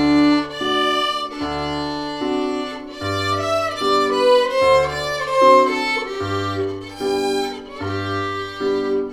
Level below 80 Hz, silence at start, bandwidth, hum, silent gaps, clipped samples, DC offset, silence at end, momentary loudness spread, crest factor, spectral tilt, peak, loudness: -48 dBFS; 0 s; 15 kHz; none; none; under 0.1%; under 0.1%; 0 s; 10 LU; 18 dB; -5 dB/octave; -2 dBFS; -19 LUFS